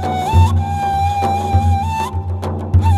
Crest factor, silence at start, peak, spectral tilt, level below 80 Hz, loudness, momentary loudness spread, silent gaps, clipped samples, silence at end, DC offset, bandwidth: 14 dB; 0 s; -2 dBFS; -7 dB/octave; -26 dBFS; -17 LUFS; 8 LU; none; under 0.1%; 0 s; under 0.1%; 12.5 kHz